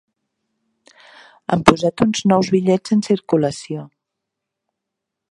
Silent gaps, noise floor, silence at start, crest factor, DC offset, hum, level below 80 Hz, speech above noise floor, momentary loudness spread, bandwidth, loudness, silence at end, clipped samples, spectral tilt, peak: none; -81 dBFS; 1.5 s; 20 dB; under 0.1%; none; -52 dBFS; 65 dB; 15 LU; 11.5 kHz; -17 LUFS; 1.45 s; under 0.1%; -6 dB/octave; 0 dBFS